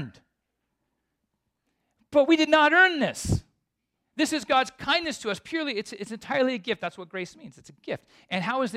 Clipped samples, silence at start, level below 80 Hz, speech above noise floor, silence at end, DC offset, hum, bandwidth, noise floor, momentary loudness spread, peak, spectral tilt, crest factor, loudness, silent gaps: under 0.1%; 0 s; -52 dBFS; 55 dB; 0 s; under 0.1%; none; 14.5 kHz; -80 dBFS; 18 LU; -6 dBFS; -4 dB/octave; 22 dB; -24 LUFS; none